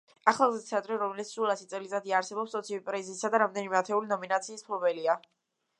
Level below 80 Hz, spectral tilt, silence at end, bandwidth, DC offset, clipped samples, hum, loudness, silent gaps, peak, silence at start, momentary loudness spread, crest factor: -86 dBFS; -3.5 dB/octave; 0.6 s; 11 kHz; under 0.1%; under 0.1%; none; -30 LUFS; none; -6 dBFS; 0.25 s; 8 LU; 24 dB